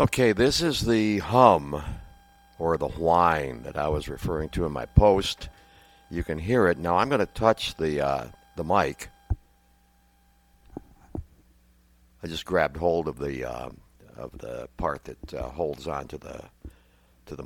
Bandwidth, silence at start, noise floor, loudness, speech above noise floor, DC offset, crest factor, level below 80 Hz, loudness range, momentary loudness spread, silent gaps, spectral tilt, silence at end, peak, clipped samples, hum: 18 kHz; 0 s; -62 dBFS; -25 LUFS; 37 dB; under 0.1%; 26 dB; -40 dBFS; 11 LU; 20 LU; none; -5.5 dB/octave; 0 s; -2 dBFS; under 0.1%; none